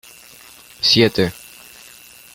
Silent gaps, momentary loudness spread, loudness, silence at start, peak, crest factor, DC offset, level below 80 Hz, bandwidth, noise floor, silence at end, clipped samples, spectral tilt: none; 26 LU; -16 LUFS; 0.8 s; 0 dBFS; 20 dB; under 0.1%; -52 dBFS; 17 kHz; -44 dBFS; 1.05 s; under 0.1%; -4 dB/octave